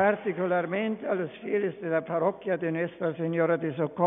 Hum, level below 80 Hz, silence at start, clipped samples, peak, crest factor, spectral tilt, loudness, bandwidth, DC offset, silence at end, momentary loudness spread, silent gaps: none; -72 dBFS; 0 s; under 0.1%; -10 dBFS; 18 dB; -10 dB/octave; -29 LUFS; 3.9 kHz; under 0.1%; 0 s; 5 LU; none